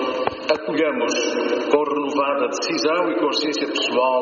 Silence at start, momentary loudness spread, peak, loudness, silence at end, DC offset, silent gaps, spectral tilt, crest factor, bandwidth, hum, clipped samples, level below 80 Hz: 0 s; 3 LU; -2 dBFS; -21 LUFS; 0 s; under 0.1%; none; -1 dB/octave; 18 dB; 7.2 kHz; none; under 0.1%; -62 dBFS